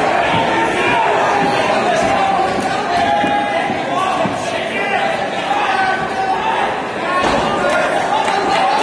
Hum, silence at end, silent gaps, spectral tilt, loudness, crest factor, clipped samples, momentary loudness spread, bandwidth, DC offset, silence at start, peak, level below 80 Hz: none; 0 s; none; -4 dB/octave; -16 LUFS; 12 dB; under 0.1%; 4 LU; 11 kHz; under 0.1%; 0 s; -2 dBFS; -46 dBFS